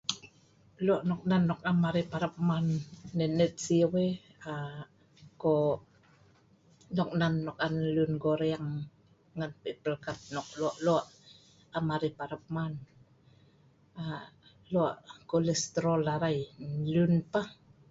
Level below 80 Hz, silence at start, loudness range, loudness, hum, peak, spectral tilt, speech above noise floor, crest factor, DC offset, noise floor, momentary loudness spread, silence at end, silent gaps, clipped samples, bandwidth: -64 dBFS; 0.1 s; 6 LU; -32 LUFS; none; -12 dBFS; -6 dB/octave; 33 dB; 20 dB; under 0.1%; -63 dBFS; 13 LU; 0.35 s; none; under 0.1%; 7.8 kHz